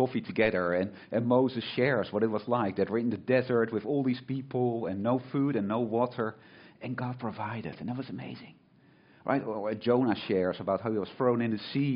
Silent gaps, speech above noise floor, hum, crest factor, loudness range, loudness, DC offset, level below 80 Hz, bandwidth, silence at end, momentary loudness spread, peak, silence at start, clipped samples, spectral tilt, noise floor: none; 31 dB; none; 18 dB; 7 LU; -30 LUFS; under 0.1%; -68 dBFS; 5.4 kHz; 0 s; 10 LU; -12 dBFS; 0 s; under 0.1%; -5.5 dB/octave; -61 dBFS